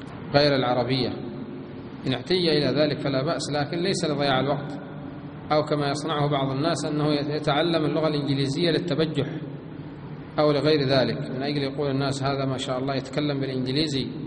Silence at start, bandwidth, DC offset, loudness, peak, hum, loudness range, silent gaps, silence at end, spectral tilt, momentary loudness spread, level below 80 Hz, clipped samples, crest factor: 0 s; 10 kHz; under 0.1%; -24 LUFS; -4 dBFS; none; 2 LU; none; 0 s; -6 dB/octave; 14 LU; -54 dBFS; under 0.1%; 22 dB